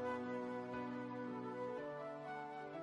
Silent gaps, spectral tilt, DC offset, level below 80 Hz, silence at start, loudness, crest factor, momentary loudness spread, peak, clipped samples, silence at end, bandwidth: none; -7 dB/octave; under 0.1%; -82 dBFS; 0 s; -46 LUFS; 12 dB; 4 LU; -32 dBFS; under 0.1%; 0 s; 11 kHz